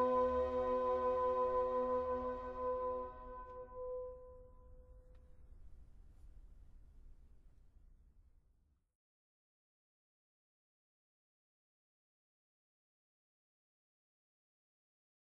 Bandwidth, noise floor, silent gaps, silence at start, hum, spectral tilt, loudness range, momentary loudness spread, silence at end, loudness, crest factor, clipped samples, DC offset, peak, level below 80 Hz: 5.2 kHz; -75 dBFS; none; 0 s; none; -8 dB/octave; 18 LU; 16 LU; 7.1 s; -38 LUFS; 18 dB; under 0.1%; under 0.1%; -26 dBFS; -60 dBFS